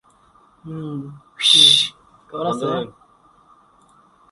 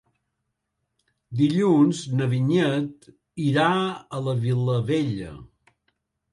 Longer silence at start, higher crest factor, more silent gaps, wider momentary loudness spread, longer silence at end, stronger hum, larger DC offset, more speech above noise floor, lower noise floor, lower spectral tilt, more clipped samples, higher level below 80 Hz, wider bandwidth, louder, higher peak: second, 0.65 s vs 1.3 s; first, 22 dB vs 16 dB; neither; first, 26 LU vs 14 LU; first, 1.4 s vs 0.9 s; neither; neither; second, 36 dB vs 56 dB; second, -54 dBFS vs -79 dBFS; second, -2 dB/octave vs -7 dB/octave; neither; about the same, -62 dBFS vs -58 dBFS; about the same, 11.5 kHz vs 11.5 kHz; first, -14 LUFS vs -23 LUFS; first, 0 dBFS vs -8 dBFS